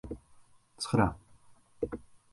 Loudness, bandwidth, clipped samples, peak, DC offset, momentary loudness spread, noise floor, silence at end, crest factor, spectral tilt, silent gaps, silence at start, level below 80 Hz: -33 LUFS; 11.5 kHz; under 0.1%; -12 dBFS; under 0.1%; 18 LU; -60 dBFS; 0.35 s; 24 dB; -6 dB/octave; none; 0.05 s; -52 dBFS